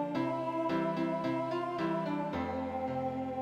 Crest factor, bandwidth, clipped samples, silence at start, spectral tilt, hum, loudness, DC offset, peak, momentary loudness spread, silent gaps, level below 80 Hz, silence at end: 12 dB; 9.6 kHz; under 0.1%; 0 s; -7.5 dB/octave; none; -34 LUFS; under 0.1%; -22 dBFS; 3 LU; none; -64 dBFS; 0 s